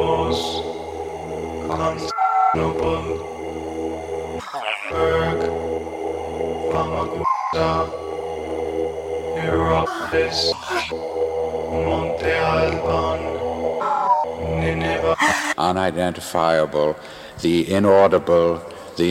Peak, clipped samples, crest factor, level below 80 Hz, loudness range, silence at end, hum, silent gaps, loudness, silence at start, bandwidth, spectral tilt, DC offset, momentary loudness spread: -2 dBFS; under 0.1%; 18 dB; -40 dBFS; 5 LU; 0 s; none; none; -21 LUFS; 0 s; 16 kHz; -5 dB/octave; under 0.1%; 10 LU